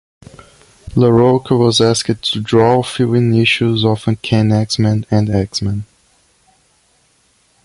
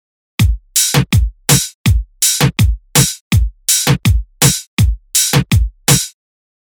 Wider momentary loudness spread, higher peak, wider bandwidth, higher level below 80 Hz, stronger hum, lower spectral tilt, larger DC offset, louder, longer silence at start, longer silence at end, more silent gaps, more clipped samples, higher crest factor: about the same, 7 LU vs 5 LU; about the same, 0 dBFS vs 0 dBFS; second, 11.5 kHz vs over 20 kHz; second, -42 dBFS vs -20 dBFS; neither; first, -6 dB/octave vs -3.5 dB/octave; neither; about the same, -14 LUFS vs -13 LUFS; first, 0.85 s vs 0.4 s; first, 1.8 s vs 0.55 s; second, none vs 1.74-1.84 s, 3.21-3.31 s, 4.67-4.77 s; neither; about the same, 14 dB vs 14 dB